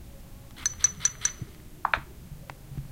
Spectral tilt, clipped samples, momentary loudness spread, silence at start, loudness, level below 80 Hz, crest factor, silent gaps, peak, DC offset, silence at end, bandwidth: -1 dB/octave; under 0.1%; 23 LU; 0 s; -27 LUFS; -48 dBFS; 28 dB; none; -4 dBFS; under 0.1%; 0 s; 17 kHz